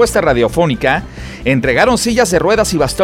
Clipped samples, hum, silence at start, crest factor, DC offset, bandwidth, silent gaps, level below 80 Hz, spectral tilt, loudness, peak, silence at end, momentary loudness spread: under 0.1%; none; 0 s; 12 dB; under 0.1%; 17 kHz; none; -30 dBFS; -4.5 dB/octave; -13 LUFS; 0 dBFS; 0 s; 6 LU